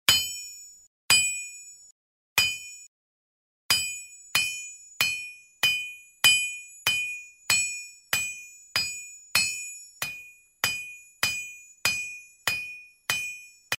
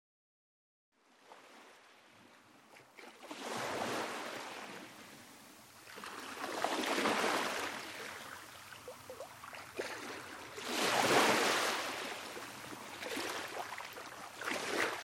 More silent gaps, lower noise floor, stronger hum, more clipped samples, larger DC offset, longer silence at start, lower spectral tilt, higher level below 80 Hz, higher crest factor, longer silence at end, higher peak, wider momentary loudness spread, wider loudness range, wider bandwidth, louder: first, 0.87-1.09 s, 1.91-2.36 s, 2.87-3.69 s vs none; second, -48 dBFS vs -62 dBFS; neither; neither; neither; second, 0.1 s vs 1.25 s; second, 1.5 dB/octave vs -2 dB/octave; first, -64 dBFS vs -78 dBFS; about the same, 28 dB vs 24 dB; about the same, 0.05 s vs 0 s; first, -2 dBFS vs -16 dBFS; second, 19 LU vs 22 LU; second, 5 LU vs 10 LU; about the same, 16 kHz vs 16.5 kHz; first, -26 LUFS vs -37 LUFS